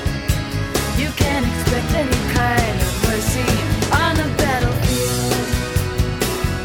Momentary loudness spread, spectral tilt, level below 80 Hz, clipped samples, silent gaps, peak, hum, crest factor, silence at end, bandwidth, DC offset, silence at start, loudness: 4 LU; -4.5 dB/octave; -26 dBFS; under 0.1%; none; -4 dBFS; none; 14 dB; 0 s; 18 kHz; 0.2%; 0 s; -19 LUFS